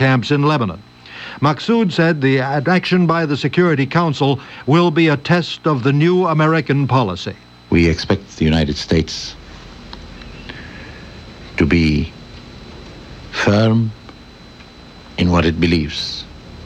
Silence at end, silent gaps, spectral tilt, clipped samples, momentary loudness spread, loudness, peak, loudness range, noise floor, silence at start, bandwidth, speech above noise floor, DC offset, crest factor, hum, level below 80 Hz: 0 s; none; -6.5 dB/octave; under 0.1%; 22 LU; -16 LUFS; -2 dBFS; 7 LU; -39 dBFS; 0 s; 8.4 kHz; 24 dB; under 0.1%; 16 dB; none; -36 dBFS